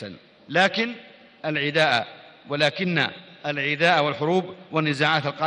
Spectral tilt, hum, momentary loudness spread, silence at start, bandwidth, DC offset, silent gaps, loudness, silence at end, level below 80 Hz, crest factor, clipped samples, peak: -5 dB/octave; none; 13 LU; 0 s; 10.5 kHz; under 0.1%; none; -23 LUFS; 0 s; -70 dBFS; 20 dB; under 0.1%; -4 dBFS